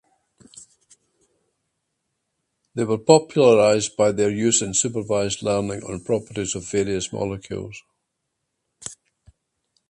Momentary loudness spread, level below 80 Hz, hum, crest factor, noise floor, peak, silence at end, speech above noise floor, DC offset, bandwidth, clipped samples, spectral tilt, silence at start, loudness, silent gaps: 19 LU; -54 dBFS; none; 24 dB; -78 dBFS; 0 dBFS; 0.95 s; 57 dB; under 0.1%; 11.5 kHz; under 0.1%; -4 dB/octave; 0.6 s; -21 LUFS; none